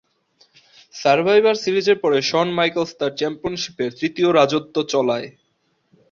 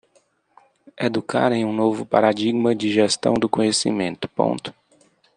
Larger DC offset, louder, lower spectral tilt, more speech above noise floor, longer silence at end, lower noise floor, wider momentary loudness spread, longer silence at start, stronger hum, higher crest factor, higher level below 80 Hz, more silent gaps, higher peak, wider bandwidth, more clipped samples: neither; about the same, -19 LUFS vs -21 LUFS; about the same, -4.5 dB/octave vs -4.5 dB/octave; first, 48 dB vs 42 dB; first, 0.8 s vs 0.65 s; first, -67 dBFS vs -62 dBFS; first, 10 LU vs 6 LU; about the same, 0.95 s vs 0.95 s; neither; about the same, 18 dB vs 20 dB; about the same, -60 dBFS vs -62 dBFS; neither; about the same, -2 dBFS vs -2 dBFS; second, 7.4 kHz vs 10 kHz; neither